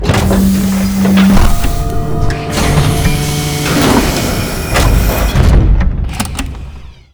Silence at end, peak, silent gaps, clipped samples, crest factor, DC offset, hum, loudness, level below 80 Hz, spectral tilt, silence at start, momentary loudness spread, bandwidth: 0.2 s; 0 dBFS; none; under 0.1%; 10 dB; under 0.1%; none; -12 LUFS; -14 dBFS; -5.5 dB/octave; 0 s; 8 LU; over 20 kHz